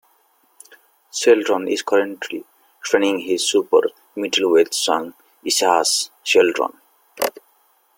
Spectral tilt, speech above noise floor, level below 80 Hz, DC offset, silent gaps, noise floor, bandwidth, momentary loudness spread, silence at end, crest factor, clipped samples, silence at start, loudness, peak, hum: -1.5 dB/octave; 42 dB; -68 dBFS; under 0.1%; none; -60 dBFS; 17 kHz; 14 LU; 0.65 s; 18 dB; under 0.1%; 1.15 s; -18 LUFS; -2 dBFS; none